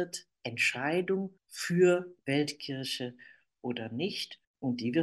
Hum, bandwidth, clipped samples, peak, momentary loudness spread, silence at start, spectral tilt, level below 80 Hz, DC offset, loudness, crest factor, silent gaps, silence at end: none; 12.5 kHz; under 0.1%; -14 dBFS; 14 LU; 0 s; -5 dB/octave; -78 dBFS; under 0.1%; -32 LUFS; 18 dB; 4.47-4.54 s; 0 s